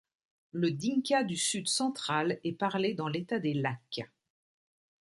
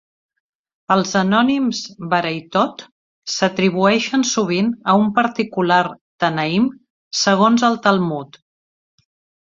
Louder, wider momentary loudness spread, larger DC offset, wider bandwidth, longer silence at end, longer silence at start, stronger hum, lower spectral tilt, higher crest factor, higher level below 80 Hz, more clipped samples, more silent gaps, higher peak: second, -32 LUFS vs -17 LUFS; about the same, 11 LU vs 9 LU; neither; first, 11.5 kHz vs 7.6 kHz; second, 1.05 s vs 1.2 s; second, 0.55 s vs 0.9 s; neither; about the same, -4 dB/octave vs -4.5 dB/octave; about the same, 18 dB vs 18 dB; second, -76 dBFS vs -60 dBFS; neither; second, none vs 2.92-3.22 s, 6.01-6.18 s, 6.90-7.11 s; second, -16 dBFS vs 0 dBFS